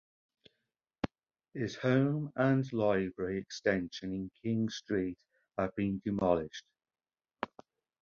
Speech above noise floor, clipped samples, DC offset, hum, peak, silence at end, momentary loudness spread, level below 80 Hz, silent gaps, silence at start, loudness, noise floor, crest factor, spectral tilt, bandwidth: over 57 dB; under 0.1%; under 0.1%; none; -14 dBFS; 0.55 s; 13 LU; -62 dBFS; none; 1.05 s; -34 LUFS; under -90 dBFS; 22 dB; -7 dB/octave; 7.2 kHz